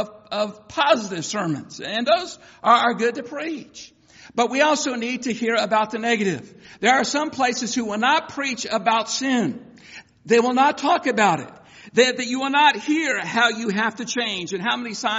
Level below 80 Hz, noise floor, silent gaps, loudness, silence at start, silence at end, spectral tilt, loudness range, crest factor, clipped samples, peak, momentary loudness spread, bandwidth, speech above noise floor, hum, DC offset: -66 dBFS; -45 dBFS; none; -21 LUFS; 0 s; 0 s; -2 dB/octave; 3 LU; 20 dB; under 0.1%; -2 dBFS; 12 LU; 8 kHz; 24 dB; none; under 0.1%